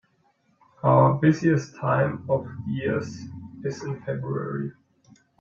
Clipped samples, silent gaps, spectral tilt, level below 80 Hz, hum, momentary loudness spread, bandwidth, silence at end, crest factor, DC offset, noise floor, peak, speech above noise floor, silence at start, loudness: under 0.1%; none; -8 dB/octave; -62 dBFS; none; 15 LU; 7.2 kHz; 0.7 s; 20 dB; under 0.1%; -66 dBFS; -6 dBFS; 42 dB; 0.85 s; -25 LUFS